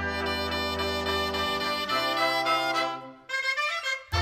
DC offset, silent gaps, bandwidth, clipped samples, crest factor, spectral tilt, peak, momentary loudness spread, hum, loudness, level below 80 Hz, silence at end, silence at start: under 0.1%; none; 16.5 kHz; under 0.1%; 14 dB; -3.5 dB/octave; -14 dBFS; 5 LU; none; -27 LUFS; -48 dBFS; 0 s; 0 s